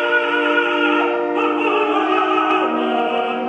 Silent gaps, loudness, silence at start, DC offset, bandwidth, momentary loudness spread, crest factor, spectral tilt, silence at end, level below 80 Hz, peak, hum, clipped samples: none; -17 LUFS; 0 s; under 0.1%; 8.6 kHz; 3 LU; 14 dB; -4.5 dB/octave; 0 s; -74 dBFS; -4 dBFS; none; under 0.1%